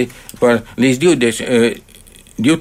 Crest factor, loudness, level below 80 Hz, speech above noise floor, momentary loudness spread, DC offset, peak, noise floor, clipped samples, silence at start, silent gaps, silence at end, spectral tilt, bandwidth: 14 dB; -15 LUFS; -46 dBFS; 26 dB; 10 LU; under 0.1%; -2 dBFS; -40 dBFS; under 0.1%; 0 s; none; 0 s; -5 dB/octave; 16 kHz